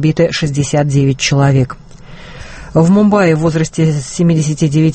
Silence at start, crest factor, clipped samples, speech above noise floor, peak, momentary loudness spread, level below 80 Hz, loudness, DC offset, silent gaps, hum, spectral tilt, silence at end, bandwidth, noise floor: 0 s; 12 dB; under 0.1%; 20 dB; 0 dBFS; 10 LU; -38 dBFS; -12 LUFS; under 0.1%; none; none; -6 dB/octave; 0 s; 8.8 kHz; -32 dBFS